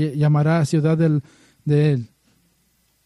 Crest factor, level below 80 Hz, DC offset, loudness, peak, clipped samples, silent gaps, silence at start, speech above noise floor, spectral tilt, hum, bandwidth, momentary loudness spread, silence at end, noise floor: 14 dB; -58 dBFS; under 0.1%; -19 LUFS; -6 dBFS; under 0.1%; none; 0 s; 46 dB; -8 dB/octave; none; 11 kHz; 9 LU; 1 s; -64 dBFS